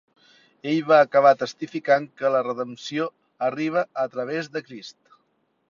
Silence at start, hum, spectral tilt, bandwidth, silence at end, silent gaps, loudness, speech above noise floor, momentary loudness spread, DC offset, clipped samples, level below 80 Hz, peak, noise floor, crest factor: 0.65 s; none; -5.5 dB/octave; 7.4 kHz; 0.8 s; none; -23 LUFS; 47 dB; 16 LU; under 0.1%; under 0.1%; -74 dBFS; -4 dBFS; -70 dBFS; 20 dB